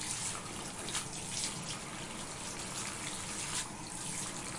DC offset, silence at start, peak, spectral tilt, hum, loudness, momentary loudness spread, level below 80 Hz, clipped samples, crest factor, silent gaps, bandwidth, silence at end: under 0.1%; 0 s; -20 dBFS; -2 dB/octave; none; -38 LUFS; 5 LU; -58 dBFS; under 0.1%; 20 dB; none; 11.5 kHz; 0 s